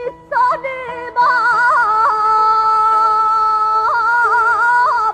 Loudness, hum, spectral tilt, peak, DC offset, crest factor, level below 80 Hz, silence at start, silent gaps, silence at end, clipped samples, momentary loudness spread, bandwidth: -13 LUFS; none; -2.5 dB/octave; -4 dBFS; under 0.1%; 10 dB; -54 dBFS; 0 s; none; 0 s; under 0.1%; 6 LU; 9.6 kHz